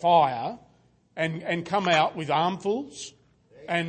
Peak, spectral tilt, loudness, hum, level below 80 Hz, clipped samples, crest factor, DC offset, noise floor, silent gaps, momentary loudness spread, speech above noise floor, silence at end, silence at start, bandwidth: -8 dBFS; -5 dB/octave; -26 LUFS; none; -68 dBFS; under 0.1%; 18 dB; under 0.1%; -62 dBFS; none; 20 LU; 37 dB; 0 s; 0 s; 8.8 kHz